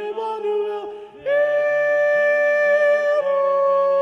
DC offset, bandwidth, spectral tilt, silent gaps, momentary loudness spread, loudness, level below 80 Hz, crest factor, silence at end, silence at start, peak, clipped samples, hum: under 0.1%; 6.2 kHz; -3.5 dB/octave; none; 10 LU; -19 LUFS; -72 dBFS; 10 dB; 0 s; 0 s; -10 dBFS; under 0.1%; none